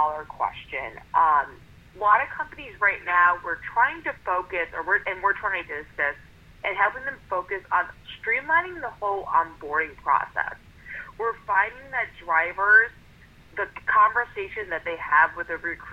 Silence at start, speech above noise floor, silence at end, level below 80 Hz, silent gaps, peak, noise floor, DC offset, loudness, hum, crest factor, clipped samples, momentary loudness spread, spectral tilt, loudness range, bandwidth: 0 s; 26 dB; 0 s; -54 dBFS; none; -6 dBFS; -51 dBFS; under 0.1%; -24 LUFS; none; 20 dB; under 0.1%; 13 LU; -5 dB/octave; 4 LU; 7.2 kHz